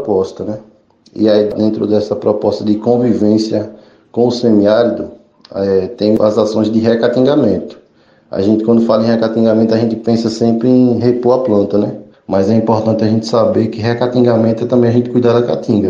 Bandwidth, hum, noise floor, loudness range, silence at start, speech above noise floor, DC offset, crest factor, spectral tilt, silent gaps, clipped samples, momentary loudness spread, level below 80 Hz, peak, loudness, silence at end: 7.6 kHz; none; -49 dBFS; 2 LU; 0 s; 37 dB; under 0.1%; 12 dB; -7.5 dB/octave; none; under 0.1%; 9 LU; -52 dBFS; 0 dBFS; -13 LUFS; 0 s